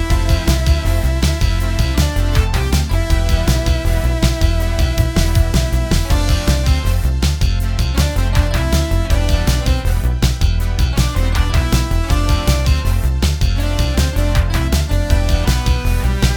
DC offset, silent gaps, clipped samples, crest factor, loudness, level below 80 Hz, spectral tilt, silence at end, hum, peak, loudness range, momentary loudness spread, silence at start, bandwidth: under 0.1%; none; under 0.1%; 14 dB; -17 LUFS; -16 dBFS; -5 dB/octave; 0 s; none; 0 dBFS; 0 LU; 2 LU; 0 s; 19.5 kHz